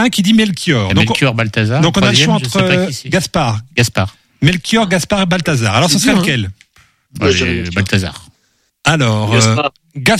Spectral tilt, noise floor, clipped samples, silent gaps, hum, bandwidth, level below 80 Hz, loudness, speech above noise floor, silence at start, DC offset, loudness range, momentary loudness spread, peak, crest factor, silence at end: -4.5 dB/octave; -60 dBFS; under 0.1%; none; none; 15.5 kHz; -40 dBFS; -13 LUFS; 47 dB; 0 s; under 0.1%; 3 LU; 6 LU; 0 dBFS; 14 dB; 0 s